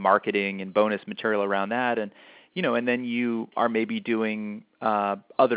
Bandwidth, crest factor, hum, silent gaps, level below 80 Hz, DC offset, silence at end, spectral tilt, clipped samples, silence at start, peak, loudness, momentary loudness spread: 4 kHz; 20 dB; none; none; -74 dBFS; under 0.1%; 0 s; -9.5 dB/octave; under 0.1%; 0 s; -6 dBFS; -26 LUFS; 6 LU